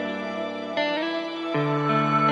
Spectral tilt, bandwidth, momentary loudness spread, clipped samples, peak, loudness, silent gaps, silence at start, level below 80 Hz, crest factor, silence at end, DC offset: -6.5 dB/octave; 8.6 kHz; 8 LU; under 0.1%; -10 dBFS; -25 LUFS; none; 0 s; -76 dBFS; 14 dB; 0 s; under 0.1%